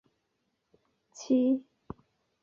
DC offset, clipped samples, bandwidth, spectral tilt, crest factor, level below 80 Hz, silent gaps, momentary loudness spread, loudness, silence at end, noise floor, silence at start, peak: under 0.1%; under 0.1%; 7.4 kHz; -6 dB/octave; 18 dB; -68 dBFS; none; 23 LU; -28 LUFS; 0.85 s; -79 dBFS; 1.2 s; -16 dBFS